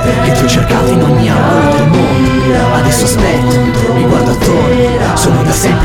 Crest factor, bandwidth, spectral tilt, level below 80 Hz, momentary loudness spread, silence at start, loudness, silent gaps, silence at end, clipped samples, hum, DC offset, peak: 8 dB; 17.5 kHz; -5.5 dB/octave; -22 dBFS; 1 LU; 0 s; -9 LUFS; none; 0 s; under 0.1%; none; under 0.1%; 0 dBFS